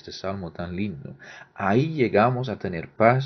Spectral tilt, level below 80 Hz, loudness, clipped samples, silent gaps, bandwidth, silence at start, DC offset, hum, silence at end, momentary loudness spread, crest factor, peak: -8 dB/octave; -52 dBFS; -25 LUFS; under 0.1%; none; 6.4 kHz; 0.05 s; under 0.1%; none; 0 s; 19 LU; 22 dB; -2 dBFS